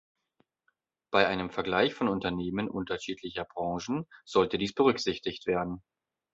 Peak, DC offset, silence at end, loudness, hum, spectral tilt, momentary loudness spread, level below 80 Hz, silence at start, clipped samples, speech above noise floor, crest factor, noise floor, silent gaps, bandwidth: -6 dBFS; under 0.1%; 0.55 s; -30 LUFS; none; -5 dB/octave; 10 LU; -58 dBFS; 1.1 s; under 0.1%; 47 dB; 26 dB; -77 dBFS; none; 8 kHz